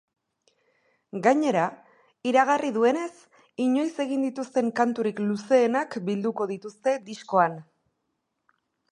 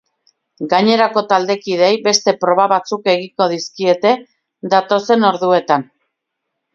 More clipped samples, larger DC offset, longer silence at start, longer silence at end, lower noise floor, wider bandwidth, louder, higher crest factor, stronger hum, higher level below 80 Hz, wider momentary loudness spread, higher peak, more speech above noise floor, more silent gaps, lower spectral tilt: neither; neither; first, 1.15 s vs 0.6 s; first, 1.3 s vs 0.9 s; about the same, -78 dBFS vs -76 dBFS; first, 11 kHz vs 7.6 kHz; second, -25 LUFS vs -15 LUFS; about the same, 20 dB vs 16 dB; neither; second, -80 dBFS vs -66 dBFS; first, 10 LU vs 6 LU; second, -6 dBFS vs 0 dBFS; second, 54 dB vs 62 dB; neither; first, -5.5 dB/octave vs -4 dB/octave